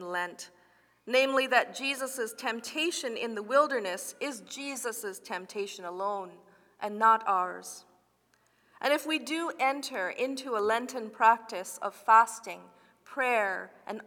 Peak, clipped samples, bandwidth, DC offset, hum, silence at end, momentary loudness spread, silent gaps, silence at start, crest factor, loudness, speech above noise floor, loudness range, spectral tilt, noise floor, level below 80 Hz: -8 dBFS; under 0.1%; 19.5 kHz; under 0.1%; none; 0 s; 14 LU; none; 0 s; 22 dB; -29 LUFS; 40 dB; 5 LU; -2 dB/octave; -70 dBFS; -86 dBFS